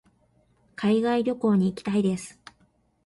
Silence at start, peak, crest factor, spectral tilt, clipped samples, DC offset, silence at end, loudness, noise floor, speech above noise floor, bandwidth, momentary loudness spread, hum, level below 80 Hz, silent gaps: 0.8 s; -12 dBFS; 14 dB; -7 dB/octave; under 0.1%; under 0.1%; 0.75 s; -25 LUFS; -65 dBFS; 42 dB; 11.5 kHz; 13 LU; none; -64 dBFS; none